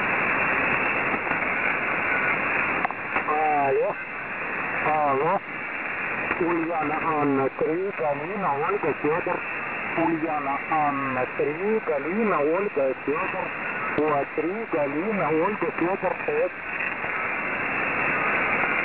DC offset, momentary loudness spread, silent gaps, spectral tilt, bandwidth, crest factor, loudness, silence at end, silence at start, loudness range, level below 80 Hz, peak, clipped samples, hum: 0.2%; 6 LU; none; -9 dB/octave; 4 kHz; 18 dB; -24 LUFS; 0 s; 0 s; 2 LU; -58 dBFS; -6 dBFS; under 0.1%; none